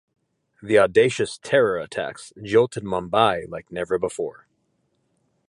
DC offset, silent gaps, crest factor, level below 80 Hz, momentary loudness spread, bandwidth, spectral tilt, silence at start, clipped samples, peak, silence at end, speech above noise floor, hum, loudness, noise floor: under 0.1%; none; 20 dB; -56 dBFS; 14 LU; 11.5 kHz; -5 dB/octave; 0.6 s; under 0.1%; -2 dBFS; 1.2 s; 48 dB; none; -22 LUFS; -70 dBFS